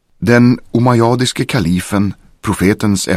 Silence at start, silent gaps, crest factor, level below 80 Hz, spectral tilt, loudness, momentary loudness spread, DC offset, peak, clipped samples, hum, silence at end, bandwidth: 0.2 s; none; 12 dB; -40 dBFS; -5.5 dB/octave; -13 LUFS; 8 LU; under 0.1%; 0 dBFS; under 0.1%; none; 0 s; 15.5 kHz